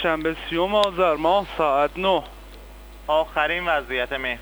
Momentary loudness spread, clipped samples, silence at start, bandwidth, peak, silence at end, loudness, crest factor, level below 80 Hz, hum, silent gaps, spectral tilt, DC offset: 6 LU; under 0.1%; 0 s; over 20 kHz; -6 dBFS; 0 s; -22 LUFS; 18 dB; -42 dBFS; 50 Hz at -45 dBFS; none; -5 dB/octave; under 0.1%